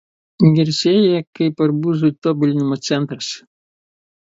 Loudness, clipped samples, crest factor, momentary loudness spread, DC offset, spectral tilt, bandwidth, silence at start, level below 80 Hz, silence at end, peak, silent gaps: -17 LUFS; under 0.1%; 16 dB; 9 LU; under 0.1%; -6.5 dB/octave; 8 kHz; 0.4 s; -60 dBFS; 0.85 s; 0 dBFS; 1.27-1.33 s, 2.18-2.22 s